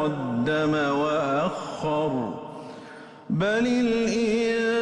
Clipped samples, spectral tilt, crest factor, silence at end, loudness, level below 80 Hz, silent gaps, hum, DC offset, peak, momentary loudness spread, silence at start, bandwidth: under 0.1%; -6 dB/octave; 10 dB; 0 s; -25 LUFS; -56 dBFS; none; none; under 0.1%; -14 dBFS; 17 LU; 0 s; 10 kHz